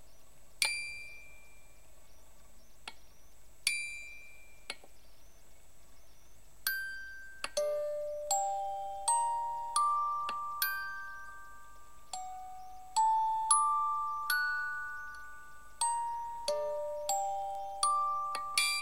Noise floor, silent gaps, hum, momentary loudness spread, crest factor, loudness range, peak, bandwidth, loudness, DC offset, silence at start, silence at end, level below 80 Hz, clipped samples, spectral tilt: -60 dBFS; none; none; 20 LU; 26 dB; 9 LU; -10 dBFS; 16 kHz; -34 LUFS; 0.4%; 0.1 s; 0 s; -64 dBFS; under 0.1%; 1.5 dB/octave